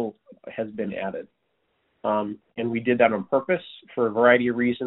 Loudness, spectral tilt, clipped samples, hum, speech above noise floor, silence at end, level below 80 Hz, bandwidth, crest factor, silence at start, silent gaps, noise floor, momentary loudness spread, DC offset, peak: -24 LUFS; -4 dB/octave; under 0.1%; none; 49 dB; 0 s; -66 dBFS; 4.1 kHz; 22 dB; 0 s; none; -72 dBFS; 15 LU; under 0.1%; -2 dBFS